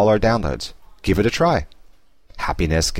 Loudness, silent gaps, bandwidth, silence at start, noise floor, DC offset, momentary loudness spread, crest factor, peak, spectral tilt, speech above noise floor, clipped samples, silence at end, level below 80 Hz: -20 LUFS; none; 16.5 kHz; 0 s; -52 dBFS; 0.5%; 12 LU; 14 dB; -6 dBFS; -5 dB/octave; 33 dB; under 0.1%; 0 s; -32 dBFS